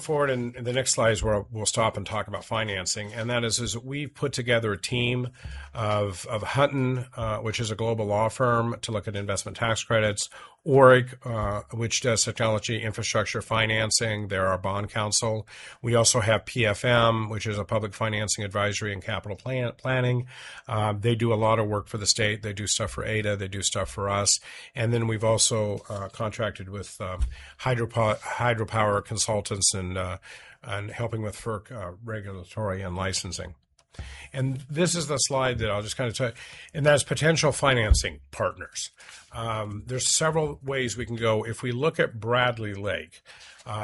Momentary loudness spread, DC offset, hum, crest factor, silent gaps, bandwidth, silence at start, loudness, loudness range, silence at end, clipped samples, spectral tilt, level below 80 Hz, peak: 13 LU; under 0.1%; none; 24 dB; none; 11.5 kHz; 0 s; -26 LUFS; 5 LU; 0 s; under 0.1%; -4 dB/octave; -42 dBFS; -4 dBFS